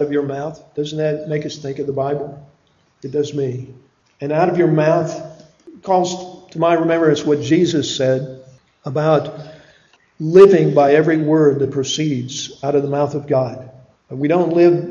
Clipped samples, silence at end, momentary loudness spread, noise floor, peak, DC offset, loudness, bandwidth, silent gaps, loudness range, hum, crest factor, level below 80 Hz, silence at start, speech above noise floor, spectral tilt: under 0.1%; 0 s; 17 LU; -57 dBFS; 0 dBFS; under 0.1%; -17 LUFS; 7.6 kHz; none; 9 LU; none; 18 dB; -58 dBFS; 0 s; 41 dB; -6 dB/octave